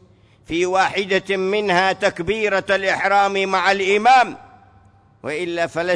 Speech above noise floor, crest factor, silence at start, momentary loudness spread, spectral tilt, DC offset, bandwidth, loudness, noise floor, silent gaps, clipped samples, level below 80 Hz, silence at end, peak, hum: 33 dB; 14 dB; 0.5 s; 9 LU; -4 dB/octave; under 0.1%; 10.5 kHz; -18 LUFS; -51 dBFS; none; under 0.1%; -54 dBFS; 0 s; -4 dBFS; none